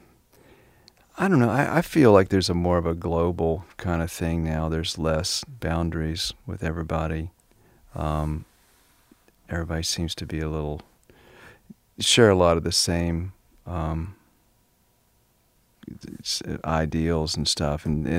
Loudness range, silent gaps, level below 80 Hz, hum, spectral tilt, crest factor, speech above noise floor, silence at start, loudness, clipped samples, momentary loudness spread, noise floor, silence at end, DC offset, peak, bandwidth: 10 LU; none; -40 dBFS; none; -5 dB/octave; 24 dB; 41 dB; 1.15 s; -24 LUFS; under 0.1%; 15 LU; -64 dBFS; 0 s; under 0.1%; -2 dBFS; 16 kHz